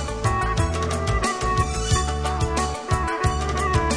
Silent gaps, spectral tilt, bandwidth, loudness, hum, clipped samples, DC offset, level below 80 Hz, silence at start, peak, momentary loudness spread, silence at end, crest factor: none; -4.5 dB/octave; 10.5 kHz; -23 LUFS; none; under 0.1%; 0.2%; -28 dBFS; 0 s; -6 dBFS; 2 LU; 0 s; 16 dB